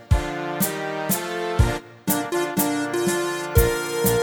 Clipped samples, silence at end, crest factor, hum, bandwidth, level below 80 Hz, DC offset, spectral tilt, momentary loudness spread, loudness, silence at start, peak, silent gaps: under 0.1%; 0 s; 20 dB; none; over 20 kHz; -30 dBFS; under 0.1%; -4.5 dB/octave; 5 LU; -23 LUFS; 0 s; -4 dBFS; none